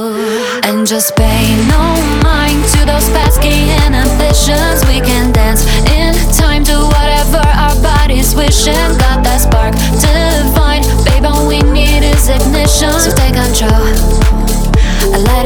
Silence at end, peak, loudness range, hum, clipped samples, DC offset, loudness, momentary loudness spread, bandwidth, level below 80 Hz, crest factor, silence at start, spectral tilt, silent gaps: 0 s; 0 dBFS; 0 LU; none; under 0.1%; under 0.1%; -10 LUFS; 2 LU; over 20 kHz; -10 dBFS; 8 dB; 0 s; -4.5 dB/octave; none